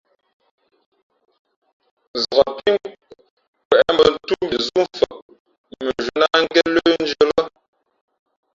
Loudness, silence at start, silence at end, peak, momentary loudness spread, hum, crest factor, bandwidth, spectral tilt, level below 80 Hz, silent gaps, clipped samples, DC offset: -18 LUFS; 2.15 s; 1.05 s; 0 dBFS; 10 LU; none; 20 dB; 7.6 kHz; -4 dB/octave; -54 dBFS; 3.30-3.37 s, 3.48-3.53 s, 3.65-3.70 s, 5.22-5.29 s, 5.40-5.45 s, 5.58-5.64 s; under 0.1%; under 0.1%